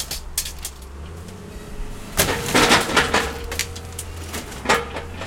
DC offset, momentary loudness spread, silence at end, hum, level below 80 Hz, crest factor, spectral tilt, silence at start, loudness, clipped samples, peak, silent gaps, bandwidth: under 0.1%; 22 LU; 0 s; none; -36 dBFS; 24 dB; -2.5 dB/octave; 0 s; -20 LUFS; under 0.1%; 0 dBFS; none; 17 kHz